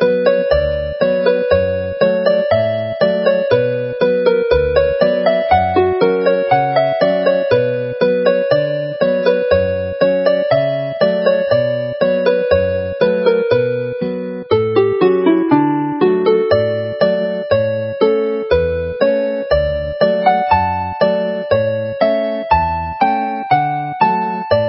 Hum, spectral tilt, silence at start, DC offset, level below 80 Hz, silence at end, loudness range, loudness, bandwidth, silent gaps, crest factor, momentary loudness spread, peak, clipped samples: none; -11 dB/octave; 0 s; under 0.1%; -36 dBFS; 0 s; 2 LU; -15 LUFS; 5.8 kHz; none; 14 dB; 5 LU; 0 dBFS; under 0.1%